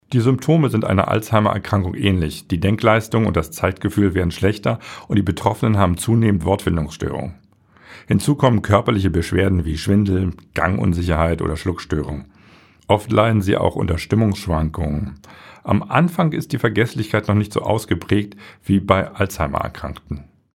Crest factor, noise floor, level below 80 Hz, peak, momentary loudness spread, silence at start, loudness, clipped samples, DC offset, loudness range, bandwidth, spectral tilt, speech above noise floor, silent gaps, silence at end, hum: 18 dB; -49 dBFS; -36 dBFS; 0 dBFS; 8 LU; 0.1 s; -19 LUFS; under 0.1%; under 0.1%; 2 LU; 16 kHz; -7 dB/octave; 31 dB; none; 0.35 s; none